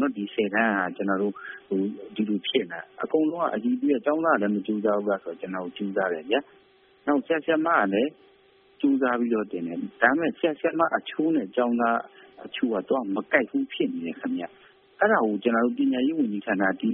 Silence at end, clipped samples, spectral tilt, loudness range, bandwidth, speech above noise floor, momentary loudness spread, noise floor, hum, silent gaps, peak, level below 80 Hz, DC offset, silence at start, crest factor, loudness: 0 s; under 0.1%; -3.5 dB/octave; 2 LU; 3.8 kHz; 33 dB; 9 LU; -59 dBFS; none; none; -4 dBFS; -72 dBFS; under 0.1%; 0 s; 22 dB; -26 LUFS